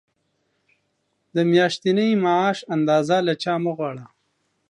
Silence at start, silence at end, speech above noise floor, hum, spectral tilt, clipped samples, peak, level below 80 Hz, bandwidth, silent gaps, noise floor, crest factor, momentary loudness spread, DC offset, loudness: 1.35 s; 0.65 s; 52 dB; none; -6 dB/octave; under 0.1%; -4 dBFS; -74 dBFS; 10.5 kHz; none; -72 dBFS; 18 dB; 10 LU; under 0.1%; -21 LUFS